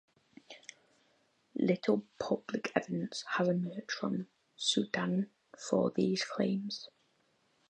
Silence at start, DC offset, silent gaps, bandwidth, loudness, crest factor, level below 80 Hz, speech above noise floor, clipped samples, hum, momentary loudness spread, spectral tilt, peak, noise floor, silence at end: 0.5 s; under 0.1%; none; 9.4 kHz; -34 LUFS; 24 dB; -78 dBFS; 40 dB; under 0.1%; none; 19 LU; -5 dB/octave; -10 dBFS; -74 dBFS; 0.85 s